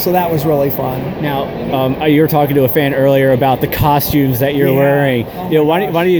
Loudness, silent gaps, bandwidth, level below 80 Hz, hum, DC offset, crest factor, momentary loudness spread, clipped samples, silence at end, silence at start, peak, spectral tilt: -13 LUFS; none; over 20 kHz; -38 dBFS; none; under 0.1%; 12 dB; 7 LU; under 0.1%; 0 s; 0 s; 0 dBFS; -7 dB/octave